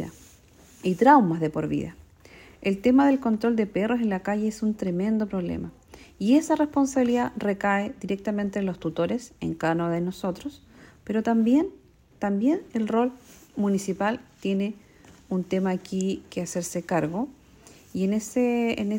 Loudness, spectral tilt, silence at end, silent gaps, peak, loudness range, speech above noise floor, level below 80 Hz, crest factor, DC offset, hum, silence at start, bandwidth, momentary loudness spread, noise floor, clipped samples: -25 LUFS; -6.5 dB/octave; 0 s; none; -4 dBFS; 5 LU; 29 dB; -58 dBFS; 22 dB; under 0.1%; none; 0 s; 16 kHz; 11 LU; -53 dBFS; under 0.1%